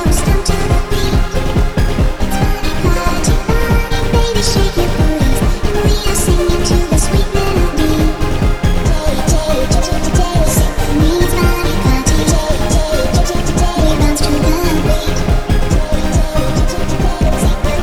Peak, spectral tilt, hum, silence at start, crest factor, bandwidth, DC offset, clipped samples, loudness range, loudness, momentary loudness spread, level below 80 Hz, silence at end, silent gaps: 0 dBFS; -5 dB/octave; none; 0 s; 12 dB; 17.5 kHz; under 0.1%; under 0.1%; 2 LU; -15 LUFS; 3 LU; -14 dBFS; 0 s; none